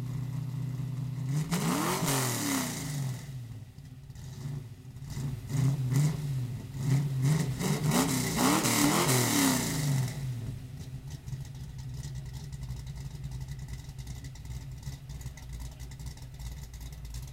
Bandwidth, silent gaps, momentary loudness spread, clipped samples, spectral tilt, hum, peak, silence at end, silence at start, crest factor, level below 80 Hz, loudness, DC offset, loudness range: 16.5 kHz; none; 18 LU; under 0.1%; -4.5 dB/octave; none; -12 dBFS; 0 s; 0 s; 20 dB; -48 dBFS; -31 LUFS; under 0.1%; 15 LU